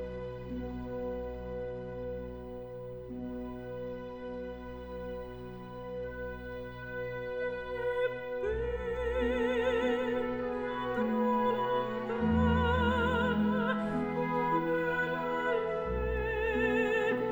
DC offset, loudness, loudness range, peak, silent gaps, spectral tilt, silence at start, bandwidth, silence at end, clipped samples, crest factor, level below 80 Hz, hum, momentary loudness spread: under 0.1%; -33 LUFS; 12 LU; -16 dBFS; none; -7.5 dB/octave; 0 s; over 20 kHz; 0 s; under 0.1%; 16 dB; -46 dBFS; none; 13 LU